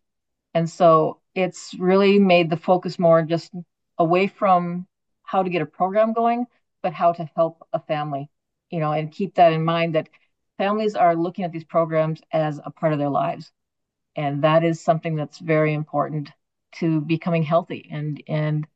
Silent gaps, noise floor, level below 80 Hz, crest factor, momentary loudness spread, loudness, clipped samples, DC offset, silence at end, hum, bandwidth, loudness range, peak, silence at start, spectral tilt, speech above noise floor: none; -81 dBFS; -74 dBFS; 18 dB; 13 LU; -21 LUFS; under 0.1%; under 0.1%; 0.1 s; none; 8.2 kHz; 5 LU; -4 dBFS; 0.55 s; -7.5 dB/octave; 60 dB